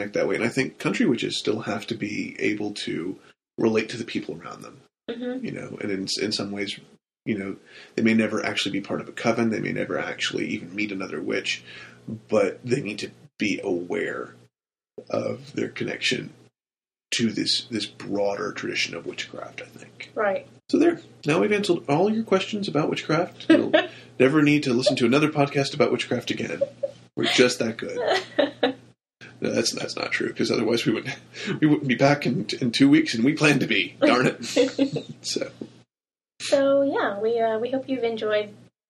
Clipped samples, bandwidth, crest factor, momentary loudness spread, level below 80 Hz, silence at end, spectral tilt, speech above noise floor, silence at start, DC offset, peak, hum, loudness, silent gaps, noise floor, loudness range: under 0.1%; 13 kHz; 22 dB; 14 LU; -66 dBFS; 0.35 s; -4.5 dB/octave; over 66 dB; 0 s; under 0.1%; -2 dBFS; none; -24 LUFS; none; under -90 dBFS; 8 LU